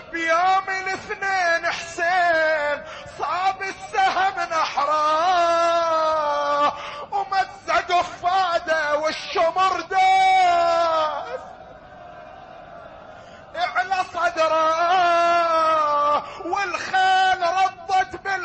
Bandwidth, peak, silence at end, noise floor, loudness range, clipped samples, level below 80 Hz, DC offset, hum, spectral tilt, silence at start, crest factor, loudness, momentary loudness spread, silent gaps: 8.6 kHz; -8 dBFS; 0 s; -42 dBFS; 5 LU; under 0.1%; -56 dBFS; under 0.1%; none; -2 dB/octave; 0 s; 12 dB; -20 LUFS; 12 LU; none